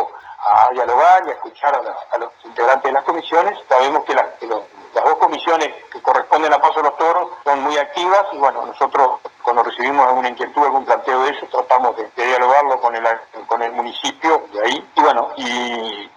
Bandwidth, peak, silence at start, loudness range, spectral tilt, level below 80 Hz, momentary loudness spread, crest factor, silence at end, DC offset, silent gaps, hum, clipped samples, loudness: 9.8 kHz; 0 dBFS; 0 s; 2 LU; -2 dB/octave; -66 dBFS; 9 LU; 16 dB; 0.1 s; under 0.1%; none; none; under 0.1%; -17 LUFS